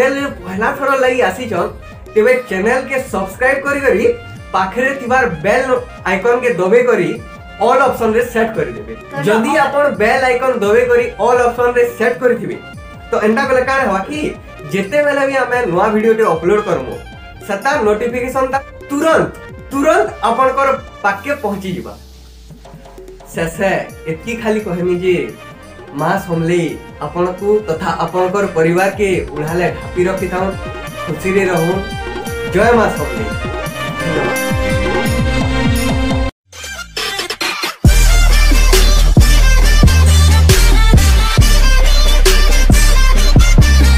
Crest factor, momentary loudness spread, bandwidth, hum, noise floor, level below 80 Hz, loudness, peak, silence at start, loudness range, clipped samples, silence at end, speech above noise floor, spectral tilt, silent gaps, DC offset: 12 dB; 12 LU; 16 kHz; none; -36 dBFS; -16 dBFS; -14 LUFS; 0 dBFS; 0 s; 7 LU; under 0.1%; 0 s; 22 dB; -5 dB/octave; 36.32-36.44 s; under 0.1%